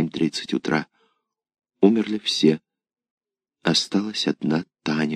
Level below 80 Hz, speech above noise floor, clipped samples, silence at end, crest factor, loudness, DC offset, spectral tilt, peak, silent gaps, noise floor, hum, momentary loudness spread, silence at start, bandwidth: -68 dBFS; 51 dB; under 0.1%; 0 s; 22 dB; -23 LUFS; under 0.1%; -5 dB/octave; -2 dBFS; 3.11-3.18 s; -72 dBFS; none; 7 LU; 0 s; 13.5 kHz